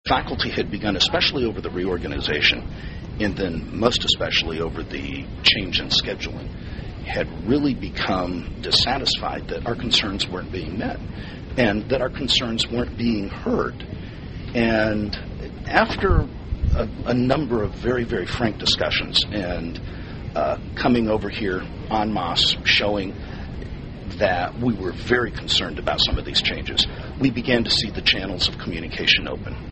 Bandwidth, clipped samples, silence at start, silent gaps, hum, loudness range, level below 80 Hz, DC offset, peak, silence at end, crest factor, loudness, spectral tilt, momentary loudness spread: 8.4 kHz; under 0.1%; 0.05 s; none; none; 3 LU; -34 dBFS; under 0.1%; 0 dBFS; 0 s; 22 dB; -22 LUFS; -4.5 dB/octave; 14 LU